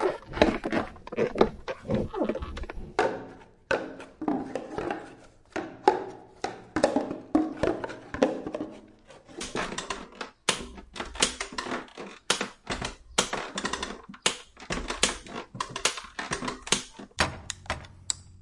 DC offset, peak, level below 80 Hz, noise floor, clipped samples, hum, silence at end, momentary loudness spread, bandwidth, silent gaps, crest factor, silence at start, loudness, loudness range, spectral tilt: under 0.1%; -2 dBFS; -48 dBFS; -52 dBFS; under 0.1%; none; 0 s; 13 LU; 11.5 kHz; none; 30 dB; 0 s; -30 LUFS; 3 LU; -3 dB/octave